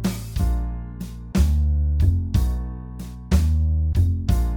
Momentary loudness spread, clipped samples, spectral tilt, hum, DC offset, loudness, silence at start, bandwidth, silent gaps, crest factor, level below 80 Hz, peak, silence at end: 14 LU; under 0.1%; -7 dB/octave; none; under 0.1%; -22 LUFS; 0 s; 17.5 kHz; none; 14 dB; -22 dBFS; -6 dBFS; 0 s